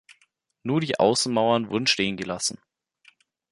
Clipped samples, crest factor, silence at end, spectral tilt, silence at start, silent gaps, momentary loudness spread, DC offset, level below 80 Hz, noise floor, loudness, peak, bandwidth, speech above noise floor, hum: under 0.1%; 20 dB; 0.95 s; -3.5 dB/octave; 0.65 s; none; 7 LU; under 0.1%; -62 dBFS; -67 dBFS; -23 LUFS; -6 dBFS; 11.5 kHz; 44 dB; none